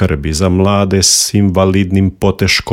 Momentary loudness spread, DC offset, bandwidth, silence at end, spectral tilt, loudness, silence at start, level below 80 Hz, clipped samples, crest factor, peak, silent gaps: 6 LU; under 0.1%; 16.5 kHz; 0 s; -4 dB/octave; -11 LUFS; 0 s; -32 dBFS; under 0.1%; 12 dB; 0 dBFS; none